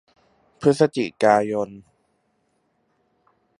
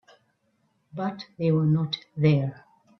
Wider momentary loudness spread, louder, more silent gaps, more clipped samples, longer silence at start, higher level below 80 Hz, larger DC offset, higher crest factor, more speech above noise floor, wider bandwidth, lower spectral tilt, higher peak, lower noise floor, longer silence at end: about the same, 9 LU vs 10 LU; first, -21 LUFS vs -26 LUFS; neither; neither; second, 0.6 s vs 0.95 s; about the same, -64 dBFS vs -66 dBFS; neither; about the same, 22 dB vs 18 dB; about the same, 49 dB vs 46 dB; first, 11 kHz vs 6 kHz; second, -6 dB/octave vs -9 dB/octave; first, -2 dBFS vs -8 dBFS; about the same, -69 dBFS vs -70 dBFS; first, 1.8 s vs 0.45 s